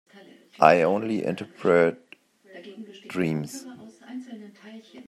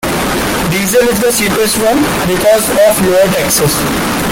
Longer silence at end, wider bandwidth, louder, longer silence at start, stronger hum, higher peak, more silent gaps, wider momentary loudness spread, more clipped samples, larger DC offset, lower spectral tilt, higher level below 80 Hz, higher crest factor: about the same, 0.05 s vs 0 s; second, 14 kHz vs 17 kHz; second, -23 LUFS vs -10 LUFS; first, 0.6 s vs 0 s; neither; about the same, -2 dBFS vs 0 dBFS; neither; first, 26 LU vs 5 LU; neither; neither; first, -6 dB/octave vs -3.5 dB/octave; second, -70 dBFS vs -32 dBFS; first, 24 dB vs 10 dB